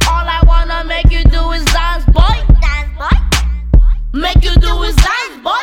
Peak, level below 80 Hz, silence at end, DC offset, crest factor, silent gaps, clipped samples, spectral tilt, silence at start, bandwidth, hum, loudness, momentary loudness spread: 0 dBFS; -10 dBFS; 0 s; under 0.1%; 10 dB; none; 2%; -4.5 dB/octave; 0 s; 15 kHz; none; -13 LUFS; 6 LU